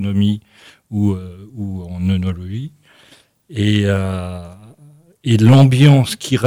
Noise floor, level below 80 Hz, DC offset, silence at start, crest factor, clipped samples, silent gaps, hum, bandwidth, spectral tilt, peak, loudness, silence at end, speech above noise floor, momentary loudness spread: -50 dBFS; -48 dBFS; under 0.1%; 0 s; 14 dB; under 0.1%; none; none; 14 kHz; -7 dB/octave; -2 dBFS; -15 LUFS; 0 s; 35 dB; 19 LU